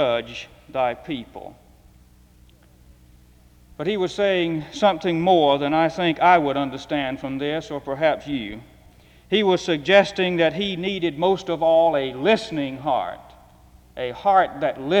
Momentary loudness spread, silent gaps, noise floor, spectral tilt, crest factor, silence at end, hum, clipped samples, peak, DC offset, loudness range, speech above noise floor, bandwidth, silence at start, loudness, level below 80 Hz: 14 LU; none; -52 dBFS; -5.5 dB/octave; 20 dB; 0 s; none; under 0.1%; -2 dBFS; under 0.1%; 10 LU; 31 dB; 11 kHz; 0 s; -21 LUFS; -54 dBFS